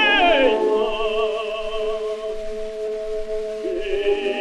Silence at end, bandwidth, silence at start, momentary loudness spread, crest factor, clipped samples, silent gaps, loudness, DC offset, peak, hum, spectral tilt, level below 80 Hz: 0 s; 11 kHz; 0 s; 13 LU; 16 dB; under 0.1%; none; -22 LUFS; under 0.1%; -6 dBFS; none; -3.5 dB/octave; -38 dBFS